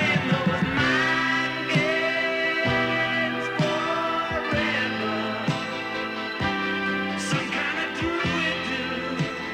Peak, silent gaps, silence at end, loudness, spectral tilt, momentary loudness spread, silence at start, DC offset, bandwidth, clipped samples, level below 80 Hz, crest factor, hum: -10 dBFS; none; 0 s; -24 LUFS; -5 dB/octave; 6 LU; 0 s; under 0.1%; 16 kHz; under 0.1%; -52 dBFS; 16 dB; none